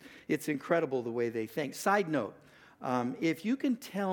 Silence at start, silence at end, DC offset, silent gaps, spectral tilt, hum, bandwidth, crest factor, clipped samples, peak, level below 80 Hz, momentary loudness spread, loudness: 0 s; 0 s; under 0.1%; none; -5.5 dB/octave; none; 19 kHz; 20 dB; under 0.1%; -12 dBFS; -78 dBFS; 6 LU; -33 LUFS